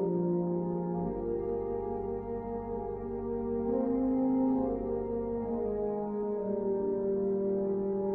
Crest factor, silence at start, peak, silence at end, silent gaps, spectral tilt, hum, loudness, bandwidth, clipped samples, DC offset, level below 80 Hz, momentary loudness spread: 12 dB; 0 s; -20 dBFS; 0 s; none; -13.5 dB/octave; none; -32 LUFS; 2.5 kHz; under 0.1%; under 0.1%; -52 dBFS; 7 LU